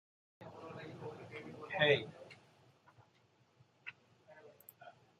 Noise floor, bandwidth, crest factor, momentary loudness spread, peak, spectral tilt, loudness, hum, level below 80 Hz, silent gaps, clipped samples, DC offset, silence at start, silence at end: -72 dBFS; 13.5 kHz; 26 dB; 28 LU; -18 dBFS; -5.5 dB/octave; -38 LUFS; none; -82 dBFS; none; under 0.1%; under 0.1%; 0.4 s; 0.3 s